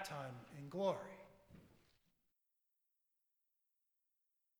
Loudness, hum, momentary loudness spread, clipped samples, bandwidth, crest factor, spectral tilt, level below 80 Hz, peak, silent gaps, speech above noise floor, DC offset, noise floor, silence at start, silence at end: -45 LUFS; none; 24 LU; under 0.1%; over 20 kHz; 24 dB; -5.5 dB/octave; -82 dBFS; -26 dBFS; none; 43 dB; under 0.1%; -87 dBFS; 0 s; 2.85 s